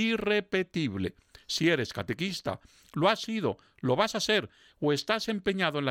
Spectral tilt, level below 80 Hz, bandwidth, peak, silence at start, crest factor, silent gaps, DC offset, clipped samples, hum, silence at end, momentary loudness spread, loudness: -4.5 dB/octave; -62 dBFS; 16.5 kHz; -10 dBFS; 0 s; 20 dB; none; under 0.1%; under 0.1%; none; 0 s; 9 LU; -29 LUFS